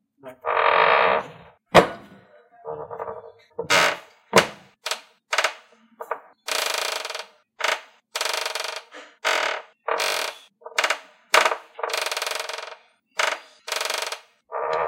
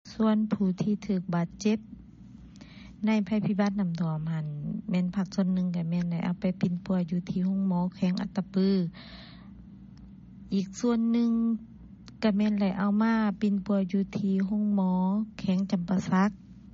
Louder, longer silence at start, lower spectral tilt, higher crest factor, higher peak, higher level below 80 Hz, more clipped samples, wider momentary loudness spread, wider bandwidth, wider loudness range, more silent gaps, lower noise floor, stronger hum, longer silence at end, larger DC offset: first, -23 LUFS vs -28 LUFS; first, 0.25 s vs 0.05 s; second, -2 dB/octave vs -7.5 dB/octave; first, 26 dB vs 14 dB; first, 0 dBFS vs -14 dBFS; about the same, -62 dBFS vs -58 dBFS; neither; first, 18 LU vs 10 LU; first, 17 kHz vs 7.4 kHz; about the same, 5 LU vs 4 LU; neither; about the same, -52 dBFS vs -49 dBFS; neither; second, 0 s vs 0.15 s; neither